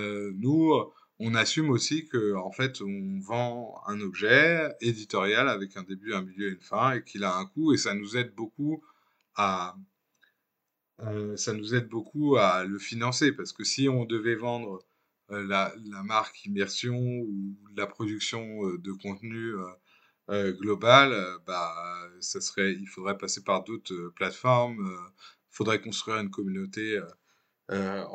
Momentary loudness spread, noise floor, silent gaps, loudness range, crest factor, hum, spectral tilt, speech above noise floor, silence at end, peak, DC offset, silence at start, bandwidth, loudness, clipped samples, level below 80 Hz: 14 LU; -83 dBFS; none; 7 LU; 26 dB; none; -4.5 dB/octave; 54 dB; 0 s; -2 dBFS; under 0.1%; 0 s; 9.2 kHz; -28 LUFS; under 0.1%; -78 dBFS